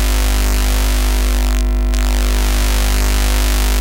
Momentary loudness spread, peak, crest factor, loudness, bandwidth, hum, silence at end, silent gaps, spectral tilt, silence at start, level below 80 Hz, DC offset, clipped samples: 1 LU; 0 dBFS; 14 dB; -16 LUFS; 17 kHz; 50 Hz at -15 dBFS; 0 s; none; -4 dB/octave; 0 s; -14 dBFS; under 0.1%; under 0.1%